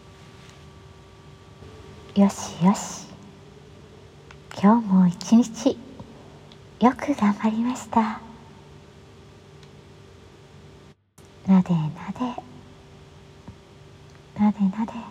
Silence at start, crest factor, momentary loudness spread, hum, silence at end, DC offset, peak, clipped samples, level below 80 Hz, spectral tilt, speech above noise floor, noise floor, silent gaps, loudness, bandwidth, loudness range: 1.6 s; 22 dB; 26 LU; none; 0 s; under 0.1%; -4 dBFS; under 0.1%; -56 dBFS; -6.5 dB/octave; 30 dB; -51 dBFS; none; -22 LUFS; 10.5 kHz; 7 LU